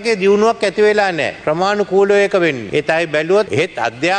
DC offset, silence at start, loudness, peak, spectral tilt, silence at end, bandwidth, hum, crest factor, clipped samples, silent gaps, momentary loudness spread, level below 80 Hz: under 0.1%; 0 s; -15 LUFS; -2 dBFS; -5 dB/octave; 0 s; 9.8 kHz; none; 12 dB; under 0.1%; none; 6 LU; -54 dBFS